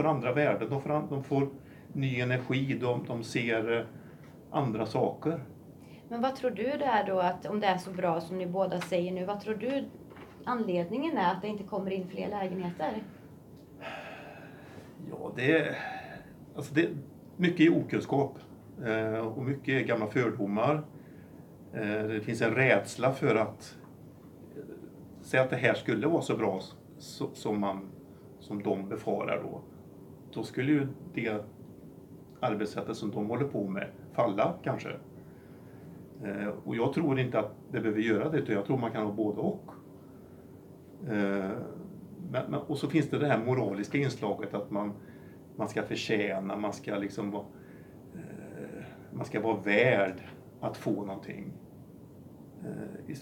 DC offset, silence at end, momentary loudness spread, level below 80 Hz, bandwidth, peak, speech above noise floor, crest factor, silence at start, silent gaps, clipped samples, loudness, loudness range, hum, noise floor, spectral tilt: under 0.1%; 0 s; 22 LU; -68 dBFS; 18.5 kHz; -10 dBFS; 21 dB; 24 dB; 0 s; none; under 0.1%; -31 LUFS; 5 LU; none; -51 dBFS; -6.5 dB/octave